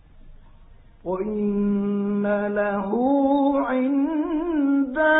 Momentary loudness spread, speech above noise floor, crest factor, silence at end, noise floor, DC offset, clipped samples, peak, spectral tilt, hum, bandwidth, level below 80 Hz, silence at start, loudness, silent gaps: 5 LU; 26 dB; 14 dB; 0 s; -48 dBFS; under 0.1%; under 0.1%; -8 dBFS; -11.5 dB/octave; none; 4 kHz; -50 dBFS; 0.15 s; -23 LUFS; none